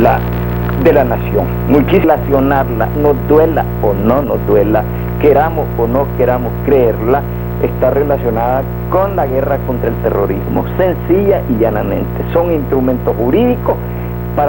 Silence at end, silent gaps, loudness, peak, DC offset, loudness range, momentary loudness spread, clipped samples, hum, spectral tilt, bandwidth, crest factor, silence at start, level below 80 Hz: 0 s; none; -13 LUFS; 0 dBFS; 1%; 3 LU; 6 LU; under 0.1%; 60 Hz at -20 dBFS; -9.5 dB/octave; 17 kHz; 12 dB; 0 s; -24 dBFS